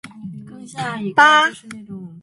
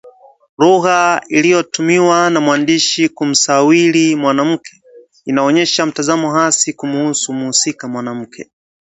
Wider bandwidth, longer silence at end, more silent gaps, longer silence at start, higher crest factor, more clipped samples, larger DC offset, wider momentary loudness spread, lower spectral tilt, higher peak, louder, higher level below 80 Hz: first, 11.5 kHz vs 8.2 kHz; second, 0.05 s vs 0.4 s; second, none vs 0.49-0.57 s; about the same, 0.05 s vs 0.05 s; about the same, 18 dB vs 14 dB; neither; neither; first, 24 LU vs 10 LU; about the same, -3 dB/octave vs -3.5 dB/octave; about the same, 0 dBFS vs 0 dBFS; about the same, -15 LUFS vs -13 LUFS; about the same, -64 dBFS vs -62 dBFS